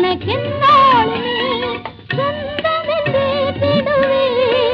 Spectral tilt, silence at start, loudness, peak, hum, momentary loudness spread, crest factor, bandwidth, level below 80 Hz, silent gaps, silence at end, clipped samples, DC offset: -7 dB/octave; 0 s; -15 LUFS; -2 dBFS; none; 10 LU; 14 dB; 6.4 kHz; -46 dBFS; none; 0 s; under 0.1%; under 0.1%